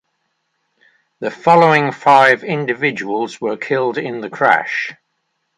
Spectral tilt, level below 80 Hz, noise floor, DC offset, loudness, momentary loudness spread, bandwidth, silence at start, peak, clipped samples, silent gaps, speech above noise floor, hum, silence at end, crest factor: -5.5 dB/octave; -66 dBFS; -70 dBFS; under 0.1%; -15 LUFS; 13 LU; 11 kHz; 1.2 s; 0 dBFS; under 0.1%; none; 55 dB; none; 0.65 s; 16 dB